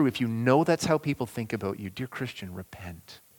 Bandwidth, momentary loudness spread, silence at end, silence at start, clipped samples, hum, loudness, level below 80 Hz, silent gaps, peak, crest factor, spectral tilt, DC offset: 19 kHz; 19 LU; 0.2 s; 0 s; under 0.1%; none; -28 LUFS; -60 dBFS; none; -8 dBFS; 20 dB; -6 dB/octave; under 0.1%